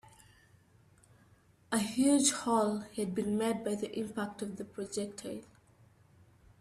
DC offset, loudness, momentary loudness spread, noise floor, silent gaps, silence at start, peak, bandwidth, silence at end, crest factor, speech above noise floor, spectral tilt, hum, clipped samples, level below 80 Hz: under 0.1%; -33 LUFS; 14 LU; -64 dBFS; none; 1.7 s; -14 dBFS; 15 kHz; 1.15 s; 20 dB; 32 dB; -4 dB/octave; none; under 0.1%; -70 dBFS